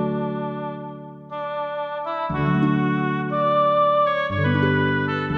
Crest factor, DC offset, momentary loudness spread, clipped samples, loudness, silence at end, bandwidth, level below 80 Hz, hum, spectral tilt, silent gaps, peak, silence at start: 14 dB; under 0.1%; 13 LU; under 0.1%; -22 LUFS; 0 s; 5.8 kHz; -50 dBFS; none; -9 dB/octave; none; -8 dBFS; 0 s